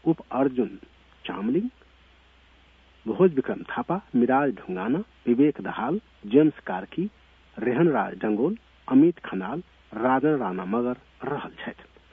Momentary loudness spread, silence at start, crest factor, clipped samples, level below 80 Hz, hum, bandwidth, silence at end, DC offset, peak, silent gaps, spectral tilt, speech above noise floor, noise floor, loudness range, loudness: 14 LU; 0.05 s; 20 dB; under 0.1%; -60 dBFS; none; 3.9 kHz; 0.3 s; under 0.1%; -6 dBFS; none; -10 dB/octave; 32 dB; -56 dBFS; 4 LU; -25 LUFS